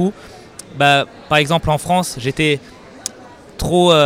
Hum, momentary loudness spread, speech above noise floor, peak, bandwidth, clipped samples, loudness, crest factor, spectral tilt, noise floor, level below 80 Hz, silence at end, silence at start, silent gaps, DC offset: none; 22 LU; 24 dB; -2 dBFS; 16.5 kHz; under 0.1%; -16 LUFS; 14 dB; -4.5 dB/octave; -39 dBFS; -38 dBFS; 0 s; 0 s; none; under 0.1%